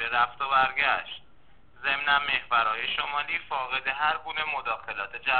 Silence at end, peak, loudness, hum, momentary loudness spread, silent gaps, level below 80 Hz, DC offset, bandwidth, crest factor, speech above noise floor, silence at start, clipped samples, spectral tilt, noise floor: 0 s; -10 dBFS; -26 LUFS; none; 8 LU; none; -60 dBFS; 0.3%; 4.7 kHz; 18 dB; 32 dB; 0 s; under 0.1%; 2 dB/octave; -59 dBFS